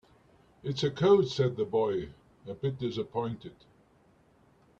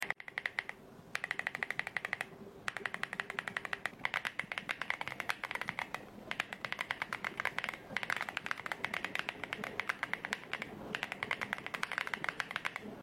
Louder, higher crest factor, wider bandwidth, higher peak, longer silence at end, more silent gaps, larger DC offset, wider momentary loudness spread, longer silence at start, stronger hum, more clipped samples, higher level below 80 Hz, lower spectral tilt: first, -30 LUFS vs -39 LUFS; second, 20 dB vs 26 dB; second, 7.8 kHz vs 16.5 kHz; about the same, -12 dBFS vs -14 dBFS; first, 1.3 s vs 0 s; neither; neither; first, 21 LU vs 5 LU; first, 0.65 s vs 0 s; neither; neither; first, -64 dBFS vs -72 dBFS; first, -7 dB/octave vs -2.5 dB/octave